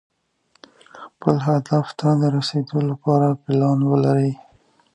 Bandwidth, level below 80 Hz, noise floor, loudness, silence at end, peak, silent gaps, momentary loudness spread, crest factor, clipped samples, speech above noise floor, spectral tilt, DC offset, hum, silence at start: 9.6 kHz; -62 dBFS; -64 dBFS; -20 LUFS; 0.6 s; 0 dBFS; none; 5 LU; 20 dB; under 0.1%; 45 dB; -8 dB/octave; under 0.1%; none; 0.95 s